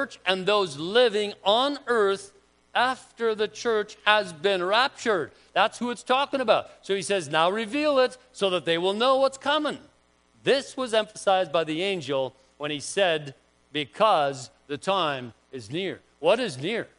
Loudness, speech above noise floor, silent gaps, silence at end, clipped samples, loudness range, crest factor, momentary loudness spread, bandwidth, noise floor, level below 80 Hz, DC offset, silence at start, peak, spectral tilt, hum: -25 LUFS; 37 dB; none; 0.15 s; under 0.1%; 3 LU; 22 dB; 10 LU; 10.5 kHz; -63 dBFS; -70 dBFS; under 0.1%; 0 s; -4 dBFS; -3.5 dB/octave; none